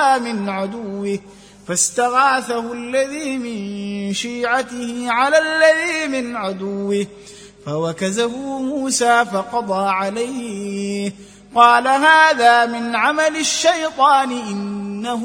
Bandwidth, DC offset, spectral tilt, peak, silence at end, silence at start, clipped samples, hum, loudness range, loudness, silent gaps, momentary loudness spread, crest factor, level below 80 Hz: 17 kHz; under 0.1%; -3 dB/octave; 0 dBFS; 0 s; 0 s; under 0.1%; 50 Hz at -55 dBFS; 6 LU; -17 LUFS; none; 13 LU; 18 dB; -58 dBFS